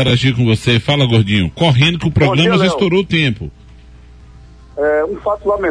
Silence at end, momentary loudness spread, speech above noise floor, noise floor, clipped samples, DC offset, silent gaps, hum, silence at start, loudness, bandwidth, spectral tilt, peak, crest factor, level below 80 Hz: 0 s; 7 LU; 26 dB; -39 dBFS; under 0.1%; under 0.1%; none; none; 0 s; -13 LUFS; 10.5 kHz; -6.5 dB/octave; -2 dBFS; 12 dB; -36 dBFS